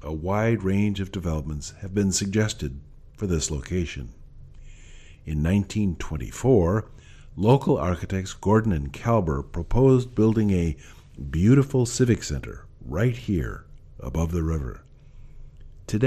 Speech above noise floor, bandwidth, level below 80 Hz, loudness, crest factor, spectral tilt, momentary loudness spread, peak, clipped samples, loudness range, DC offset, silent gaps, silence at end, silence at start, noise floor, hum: 22 dB; 14 kHz; -38 dBFS; -24 LUFS; 18 dB; -6.5 dB/octave; 18 LU; -6 dBFS; under 0.1%; 7 LU; under 0.1%; none; 0 s; 0 s; -45 dBFS; none